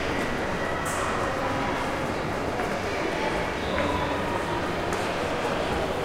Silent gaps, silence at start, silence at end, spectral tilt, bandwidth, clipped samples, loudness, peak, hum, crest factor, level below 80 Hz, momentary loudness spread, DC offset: none; 0 s; 0 s; -4.5 dB/octave; 16.5 kHz; under 0.1%; -27 LUFS; -12 dBFS; none; 16 dB; -42 dBFS; 2 LU; under 0.1%